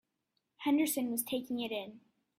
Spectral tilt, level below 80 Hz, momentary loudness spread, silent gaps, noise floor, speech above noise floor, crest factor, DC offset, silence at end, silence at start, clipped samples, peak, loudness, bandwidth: -3 dB/octave; -80 dBFS; 10 LU; none; -84 dBFS; 50 dB; 18 dB; under 0.1%; 0.4 s; 0.6 s; under 0.1%; -20 dBFS; -34 LUFS; 16 kHz